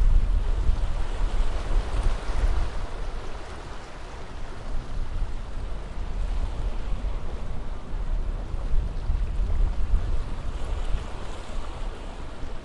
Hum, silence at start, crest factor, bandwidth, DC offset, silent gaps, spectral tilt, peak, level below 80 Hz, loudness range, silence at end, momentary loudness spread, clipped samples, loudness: none; 0 s; 16 dB; 9.8 kHz; under 0.1%; none; -6 dB/octave; -8 dBFS; -26 dBFS; 5 LU; 0 s; 10 LU; under 0.1%; -33 LUFS